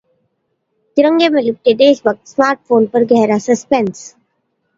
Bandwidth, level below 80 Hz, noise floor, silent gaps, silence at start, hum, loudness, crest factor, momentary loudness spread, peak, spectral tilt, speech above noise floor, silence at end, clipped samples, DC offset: 7.8 kHz; -60 dBFS; -68 dBFS; none; 0.95 s; none; -13 LUFS; 14 dB; 6 LU; 0 dBFS; -5 dB/octave; 55 dB; 0.7 s; under 0.1%; under 0.1%